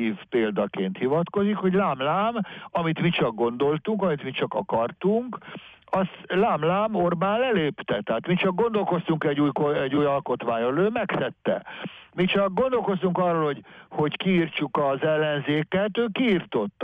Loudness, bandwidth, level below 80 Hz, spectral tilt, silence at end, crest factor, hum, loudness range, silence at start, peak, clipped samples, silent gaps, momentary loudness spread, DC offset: -25 LUFS; 4.9 kHz; -60 dBFS; -9 dB/octave; 0 s; 12 dB; none; 2 LU; 0 s; -12 dBFS; under 0.1%; none; 6 LU; under 0.1%